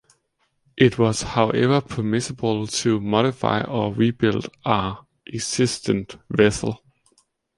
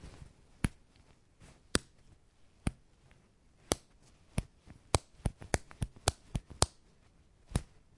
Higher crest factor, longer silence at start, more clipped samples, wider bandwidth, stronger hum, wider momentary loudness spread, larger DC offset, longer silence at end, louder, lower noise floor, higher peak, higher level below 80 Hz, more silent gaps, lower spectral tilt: second, 20 dB vs 38 dB; first, 0.75 s vs 0.05 s; neither; about the same, 11.5 kHz vs 11.5 kHz; neither; about the same, 10 LU vs 10 LU; neither; first, 0.8 s vs 0.35 s; first, -22 LUFS vs -38 LUFS; first, -70 dBFS vs -65 dBFS; about the same, -2 dBFS vs -2 dBFS; about the same, -50 dBFS vs -48 dBFS; neither; about the same, -5 dB/octave vs -4 dB/octave